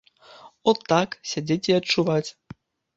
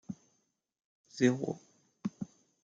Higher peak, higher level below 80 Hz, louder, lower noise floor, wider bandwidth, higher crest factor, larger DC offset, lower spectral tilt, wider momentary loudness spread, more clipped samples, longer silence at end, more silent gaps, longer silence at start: first, -4 dBFS vs -14 dBFS; first, -64 dBFS vs -80 dBFS; first, -23 LUFS vs -34 LUFS; second, -49 dBFS vs -78 dBFS; about the same, 8 kHz vs 7.8 kHz; about the same, 20 dB vs 24 dB; neither; about the same, -5 dB/octave vs -6 dB/octave; second, 8 LU vs 19 LU; neither; first, 0.65 s vs 0.35 s; second, none vs 0.84-1.04 s; first, 0.45 s vs 0.1 s